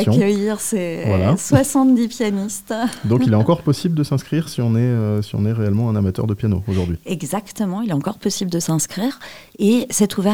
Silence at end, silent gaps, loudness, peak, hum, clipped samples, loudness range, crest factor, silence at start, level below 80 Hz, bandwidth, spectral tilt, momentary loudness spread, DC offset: 0 s; none; -19 LUFS; 0 dBFS; none; under 0.1%; 4 LU; 18 dB; 0 s; -50 dBFS; 17.5 kHz; -6 dB/octave; 8 LU; 0.3%